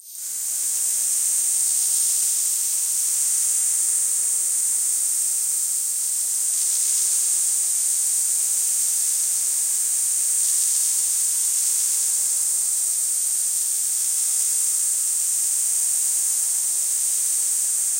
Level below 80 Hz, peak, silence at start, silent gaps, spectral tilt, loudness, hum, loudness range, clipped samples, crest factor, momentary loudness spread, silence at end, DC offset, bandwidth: -86 dBFS; -8 dBFS; 0.05 s; none; 5 dB/octave; -18 LUFS; none; 1 LU; under 0.1%; 14 dB; 2 LU; 0 s; under 0.1%; 16 kHz